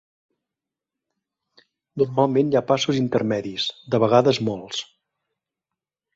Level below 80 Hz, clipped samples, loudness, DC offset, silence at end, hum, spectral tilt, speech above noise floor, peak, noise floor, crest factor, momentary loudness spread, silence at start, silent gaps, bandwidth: -62 dBFS; under 0.1%; -21 LUFS; under 0.1%; 1.3 s; none; -5.5 dB/octave; 66 dB; -2 dBFS; -87 dBFS; 22 dB; 13 LU; 1.95 s; none; 8 kHz